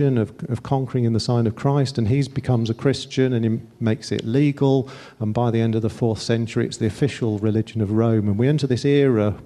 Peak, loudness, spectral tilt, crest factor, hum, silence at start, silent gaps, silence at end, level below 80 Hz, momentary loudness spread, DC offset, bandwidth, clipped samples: -6 dBFS; -21 LUFS; -7.5 dB/octave; 16 dB; none; 0 s; none; 0 s; -52 dBFS; 6 LU; under 0.1%; 11 kHz; under 0.1%